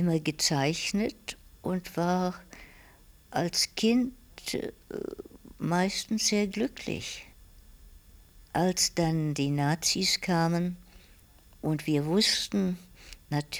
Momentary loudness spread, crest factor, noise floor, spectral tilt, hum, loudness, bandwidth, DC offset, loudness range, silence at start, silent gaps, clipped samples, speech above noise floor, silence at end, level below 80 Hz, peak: 15 LU; 18 dB; -56 dBFS; -4 dB/octave; none; -29 LUFS; over 20 kHz; under 0.1%; 4 LU; 0 s; none; under 0.1%; 28 dB; 0 s; -56 dBFS; -12 dBFS